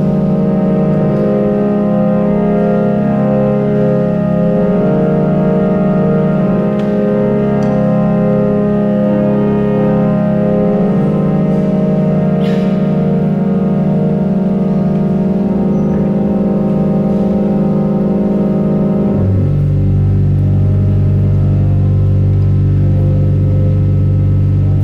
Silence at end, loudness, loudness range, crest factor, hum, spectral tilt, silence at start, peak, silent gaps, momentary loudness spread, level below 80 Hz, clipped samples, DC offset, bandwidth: 0 s; -12 LUFS; 1 LU; 8 dB; none; -11 dB/octave; 0 s; -2 dBFS; none; 1 LU; -28 dBFS; under 0.1%; under 0.1%; 5.2 kHz